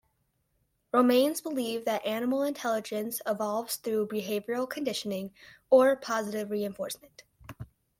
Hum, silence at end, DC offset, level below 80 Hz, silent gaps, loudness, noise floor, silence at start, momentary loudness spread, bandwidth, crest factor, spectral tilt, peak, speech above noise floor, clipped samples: none; 0.35 s; under 0.1%; -68 dBFS; none; -29 LUFS; -75 dBFS; 0.95 s; 14 LU; 16.5 kHz; 20 dB; -4 dB/octave; -10 dBFS; 46 dB; under 0.1%